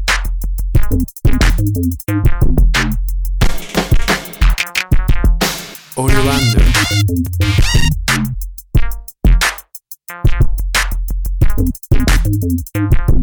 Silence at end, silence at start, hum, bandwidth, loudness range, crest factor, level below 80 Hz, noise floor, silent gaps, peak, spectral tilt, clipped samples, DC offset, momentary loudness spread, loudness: 0 s; 0 s; none; 19.5 kHz; 3 LU; 12 dB; -14 dBFS; -35 dBFS; none; 0 dBFS; -4.5 dB/octave; under 0.1%; 1%; 9 LU; -16 LUFS